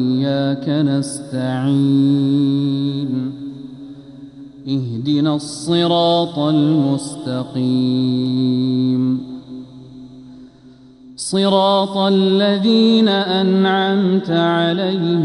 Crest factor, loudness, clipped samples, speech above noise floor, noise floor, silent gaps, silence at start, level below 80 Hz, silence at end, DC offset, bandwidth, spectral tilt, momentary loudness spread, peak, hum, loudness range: 16 dB; -17 LUFS; under 0.1%; 28 dB; -44 dBFS; none; 0 s; -60 dBFS; 0 s; under 0.1%; 11.5 kHz; -6 dB/octave; 17 LU; -2 dBFS; none; 6 LU